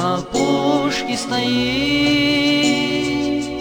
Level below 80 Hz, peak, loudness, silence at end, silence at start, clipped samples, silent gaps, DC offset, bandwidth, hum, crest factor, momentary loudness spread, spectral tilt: -44 dBFS; -4 dBFS; -17 LUFS; 0 s; 0 s; under 0.1%; none; under 0.1%; 18.5 kHz; none; 14 dB; 5 LU; -4 dB/octave